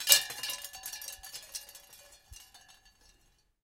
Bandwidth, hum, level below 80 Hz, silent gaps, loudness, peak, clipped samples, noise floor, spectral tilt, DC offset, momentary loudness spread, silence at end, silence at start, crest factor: 17 kHz; none; -66 dBFS; none; -32 LUFS; -2 dBFS; under 0.1%; -69 dBFS; 2.5 dB/octave; under 0.1%; 27 LU; 1.05 s; 0 s; 34 dB